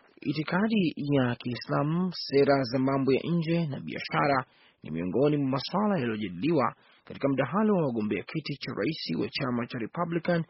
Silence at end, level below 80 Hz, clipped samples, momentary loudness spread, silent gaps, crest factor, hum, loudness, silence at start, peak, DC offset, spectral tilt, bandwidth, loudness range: 0.05 s; -64 dBFS; under 0.1%; 9 LU; none; 18 dB; none; -28 LUFS; 0.25 s; -10 dBFS; under 0.1%; -5.5 dB/octave; 6 kHz; 3 LU